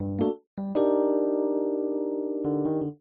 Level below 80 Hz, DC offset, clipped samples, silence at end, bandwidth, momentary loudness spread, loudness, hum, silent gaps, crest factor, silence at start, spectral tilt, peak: -64 dBFS; under 0.1%; under 0.1%; 0.05 s; 3.8 kHz; 6 LU; -27 LUFS; none; 0.47-0.57 s; 14 dB; 0 s; -9.5 dB/octave; -12 dBFS